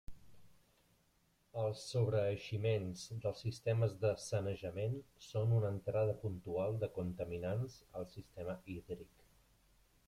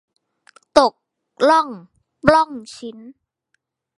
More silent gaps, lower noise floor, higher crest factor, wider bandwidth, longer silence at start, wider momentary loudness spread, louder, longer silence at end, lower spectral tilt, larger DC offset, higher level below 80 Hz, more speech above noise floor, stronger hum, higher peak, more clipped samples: neither; about the same, -75 dBFS vs -72 dBFS; about the same, 18 dB vs 20 dB; about the same, 12.5 kHz vs 11.5 kHz; second, 0.1 s vs 0.75 s; second, 12 LU vs 19 LU; second, -40 LUFS vs -17 LUFS; about the same, 1 s vs 0.9 s; first, -7 dB/octave vs -4.5 dB/octave; neither; second, -66 dBFS vs -52 dBFS; second, 37 dB vs 54 dB; neither; second, -22 dBFS vs 0 dBFS; neither